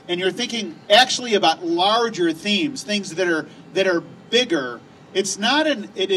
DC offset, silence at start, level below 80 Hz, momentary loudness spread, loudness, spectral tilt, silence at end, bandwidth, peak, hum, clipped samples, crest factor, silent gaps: under 0.1%; 0.05 s; -68 dBFS; 10 LU; -20 LUFS; -3 dB/octave; 0 s; 14 kHz; -2 dBFS; none; under 0.1%; 18 dB; none